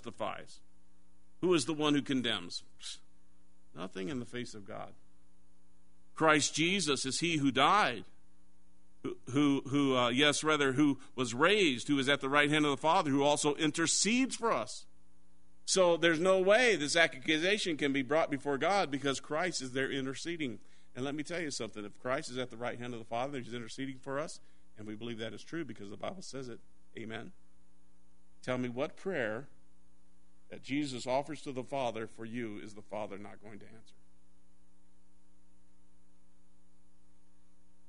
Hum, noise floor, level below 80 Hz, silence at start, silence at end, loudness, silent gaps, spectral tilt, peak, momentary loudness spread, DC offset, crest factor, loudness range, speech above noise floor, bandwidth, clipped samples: none; -70 dBFS; -68 dBFS; 0.05 s; 4.15 s; -32 LUFS; none; -3.5 dB/octave; -10 dBFS; 18 LU; 0.5%; 24 dB; 15 LU; 37 dB; 10.5 kHz; under 0.1%